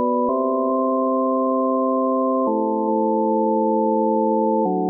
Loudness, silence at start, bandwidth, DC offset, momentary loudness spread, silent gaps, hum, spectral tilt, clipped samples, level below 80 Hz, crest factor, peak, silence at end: -20 LUFS; 0 s; 1.2 kHz; under 0.1%; 1 LU; none; none; -16 dB/octave; under 0.1%; -68 dBFS; 10 dB; -8 dBFS; 0 s